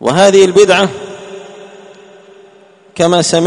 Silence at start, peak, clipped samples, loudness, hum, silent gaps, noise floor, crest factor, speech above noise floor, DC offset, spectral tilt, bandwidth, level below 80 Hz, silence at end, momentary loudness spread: 0 s; 0 dBFS; 0.2%; -9 LUFS; none; none; -43 dBFS; 12 dB; 35 dB; under 0.1%; -4 dB/octave; 11 kHz; -52 dBFS; 0 s; 23 LU